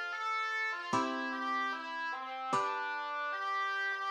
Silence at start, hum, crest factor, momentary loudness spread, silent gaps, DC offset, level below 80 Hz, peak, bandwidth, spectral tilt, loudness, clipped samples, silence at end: 0 s; none; 16 dB; 4 LU; none; under 0.1%; -88 dBFS; -20 dBFS; 14 kHz; -3 dB/octave; -35 LUFS; under 0.1%; 0 s